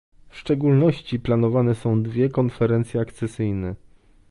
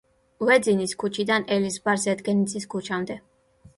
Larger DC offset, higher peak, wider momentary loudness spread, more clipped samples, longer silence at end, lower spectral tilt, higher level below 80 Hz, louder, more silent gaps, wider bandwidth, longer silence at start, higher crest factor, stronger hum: neither; about the same, -6 dBFS vs -6 dBFS; about the same, 10 LU vs 10 LU; neither; about the same, 0.55 s vs 0.6 s; first, -9 dB/octave vs -4.5 dB/octave; first, -48 dBFS vs -64 dBFS; about the same, -22 LUFS vs -24 LUFS; neither; about the same, 11.5 kHz vs 11.5 kHz; about the same, 0.35 s vs 0.4 s; about the same, 16 dB vs 20 dB; neither